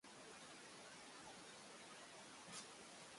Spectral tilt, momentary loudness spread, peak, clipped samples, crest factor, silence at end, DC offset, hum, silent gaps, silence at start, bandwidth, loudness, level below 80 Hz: -1.5 dB/octave; 3 LU; -42 dBFS; under 0.1%; 18 dB; 0 s; under 0.1%; none; none; 0.05 s; 11.5 kHz; -57 LUFS; -88 dBFS